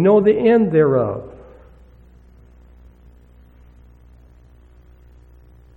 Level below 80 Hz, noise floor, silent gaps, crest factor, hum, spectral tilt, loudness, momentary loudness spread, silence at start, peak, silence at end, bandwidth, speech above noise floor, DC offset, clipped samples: -48 dBFS; -47 dBFS; none; 18 dB; none; -10.5 dB/octave; -16 LUFS; 16 LU; 0 s; -4 dBFS; 4.45 s; 4.3 kHz; 33 dB; under 0.1%; under 0.1%